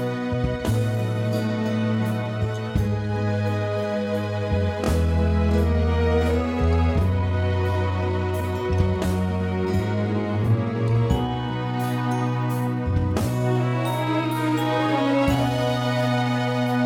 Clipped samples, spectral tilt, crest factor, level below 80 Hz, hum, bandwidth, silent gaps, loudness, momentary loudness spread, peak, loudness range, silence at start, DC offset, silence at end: under 0.1%; -7.5 dB/octave; 16 dB; -34 dBFS; none; 16 kHz; none; -23 LUFS; 4 LU; -6 dBFS; 3 LU; 0 s; under 0.1%; 0 s